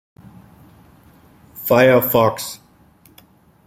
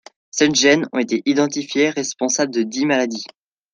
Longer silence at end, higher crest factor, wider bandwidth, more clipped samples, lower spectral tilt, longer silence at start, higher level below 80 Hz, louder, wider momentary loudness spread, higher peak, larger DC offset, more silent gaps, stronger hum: first, 1.1 s vs 0.45 s; about the same, 18 dB vs 18 dB; first, 16.5 kHz vs 10 kHz; neither; first, -5.5 dB/octave vs -3 dB/octave; first, 1.55 s vs 0.35 s; first, -56 dBFS vs -64 dBFS; about the same, -16 LUFS vs -18 LUFS; first, 17 LU vs 10 LU; about the same, -2 dBFS vs -2 dBFS; neither; neither; neither